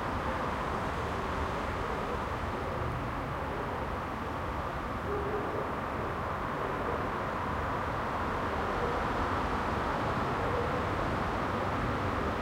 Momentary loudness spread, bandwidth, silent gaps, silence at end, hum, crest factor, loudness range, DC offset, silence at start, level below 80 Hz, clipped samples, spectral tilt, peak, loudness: 4 LU; 16.5 kHz; none; 0 s; none; 14 dB; 3 LU; under 0.1%; 0 s; -44 dBFS; under 0.1%; -6.5 dB/octave; -20 dBFS; -33 LUFS